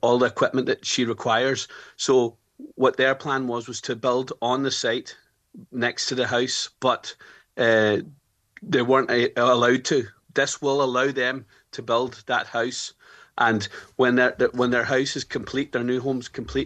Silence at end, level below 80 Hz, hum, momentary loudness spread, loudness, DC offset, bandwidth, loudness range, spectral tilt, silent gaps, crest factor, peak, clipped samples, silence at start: 0 s; -58 dBFS; none; 10 LU; -23 LUFS; under 0.1%; 9.2 kHz; 4 LU; -4 dB/octave; none; 18 dB; -6 dBFS; under 0.1%; 0.05 s